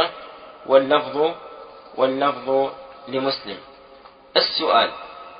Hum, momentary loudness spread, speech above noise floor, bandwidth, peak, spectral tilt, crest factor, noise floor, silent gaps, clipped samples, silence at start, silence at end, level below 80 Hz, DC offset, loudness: none; 21 LU; 27 dB; 5.2 kHz; -2 dBFS; -8.5 dB/octave; 22 dB; -47 dBFS; none; under 0.1%; 0 s; 0 s; -64 dBFS; under 0.1%; -21 LUFS